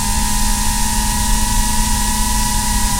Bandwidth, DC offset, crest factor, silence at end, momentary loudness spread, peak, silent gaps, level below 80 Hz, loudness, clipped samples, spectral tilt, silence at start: 16 kHz; under 0.1%; 14 dB; 0 s; 1 LU; -2 dBFS; none; -18 dBFS; -16 LUFS; under 0.1%; -2.5 dB/octave; 0 s